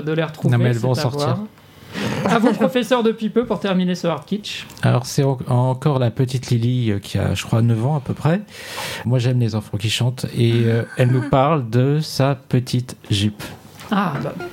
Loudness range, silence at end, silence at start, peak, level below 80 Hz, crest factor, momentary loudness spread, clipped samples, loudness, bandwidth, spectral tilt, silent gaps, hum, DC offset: 2 LU; 0 s; 0 s; -2 dBFS; -52 dBFS; 18 dB; 8 LU; under 0.1%; -19 LUFS; 16 kHz; -6.5 dB/octave; none; none; under 0.1%